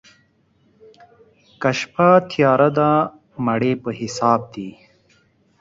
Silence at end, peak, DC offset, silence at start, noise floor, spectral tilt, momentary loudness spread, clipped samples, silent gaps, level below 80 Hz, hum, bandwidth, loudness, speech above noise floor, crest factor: 0.9 s; -2 dBFS; under 0.1%; 1.6 s; -60 dBFS; -6.5 dB/octave; 12 LU; under 0.1%; none; -60 dBFS; none; 7.8 kHz; -18 LUFS; 42 dB; 18 dB